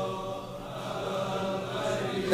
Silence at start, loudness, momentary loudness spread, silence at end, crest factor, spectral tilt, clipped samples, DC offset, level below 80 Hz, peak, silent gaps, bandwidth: 0 s; -33 LUFS; 7 LU; 0 s; 20 dB; -5 dB/octave; under 0.1%; under 0.1%; -56 dBFS; -12 dBFS; none; 15.5 kHz